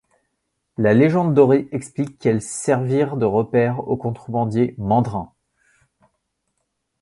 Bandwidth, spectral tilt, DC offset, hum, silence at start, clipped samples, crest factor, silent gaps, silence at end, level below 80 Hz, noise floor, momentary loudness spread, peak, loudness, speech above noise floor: 11.5 kHz; -7.5 dB/octave; under 0.1%; none; 0.8 s; under 0.1%; 18 dB; none; 1.75 s; -52 dBFS; -74 dBFS; 11 LU; -2 dBFS; -19 LUFS; 56 dB